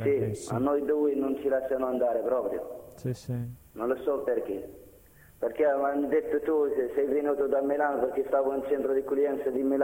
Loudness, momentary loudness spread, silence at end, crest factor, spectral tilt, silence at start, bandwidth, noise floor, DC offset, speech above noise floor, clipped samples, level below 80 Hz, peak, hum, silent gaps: -29 LUFS; 9 LU; 0 s; 14 dB; -7.5 dB/octave; 0 s; 16.5 kHz; -55 dBFS; under 0.1%; 27 dB; under 0.1%; -60 dBFS; -14 dBFS; none; none